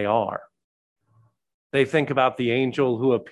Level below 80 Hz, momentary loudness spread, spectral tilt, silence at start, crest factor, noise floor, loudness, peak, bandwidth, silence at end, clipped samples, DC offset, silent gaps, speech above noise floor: -66 dBFS; 6 LU; -7 dB/octave; 0 s; 18 dB; -62 dBFS; -23 LUFS; -6 dBFS; 11 kHz; 0 s; under 0.1%; under 0.1%; 0.64-0.96 s, 1.54-1.70 s; 40 dB